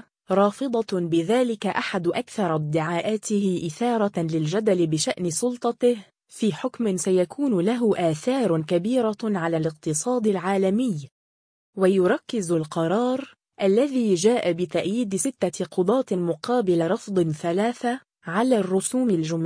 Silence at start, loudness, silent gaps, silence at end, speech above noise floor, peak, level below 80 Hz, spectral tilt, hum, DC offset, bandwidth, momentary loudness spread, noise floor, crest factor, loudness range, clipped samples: 0.3 s; -24 LUFS; 11.11-11.73 s; 0 s; over 67 dB; -6 dBFS; -68 dBFS; -5.5 dB/octave; none; under 0.1%; 10.5 kHz; 5 LU; under -90 dBFS; 16 dB; 1 LU; under 0.1%